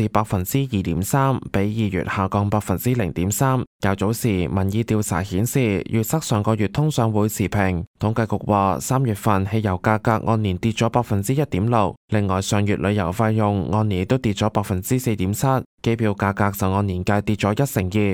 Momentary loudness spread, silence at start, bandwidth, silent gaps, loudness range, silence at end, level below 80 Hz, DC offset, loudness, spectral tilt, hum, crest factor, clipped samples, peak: 3 LU; 0 s; 18.5 kHz; 3.67-3.79 s, 7.87-7.94 s, 11.97-12.08 s, 15.66-15.78 s; 1 LU; 0 s; -44 dBFS; under 0.1%; -21 LUFS; -6 dB/octave; none; 16 dB; under 0.1%; -4 dBFS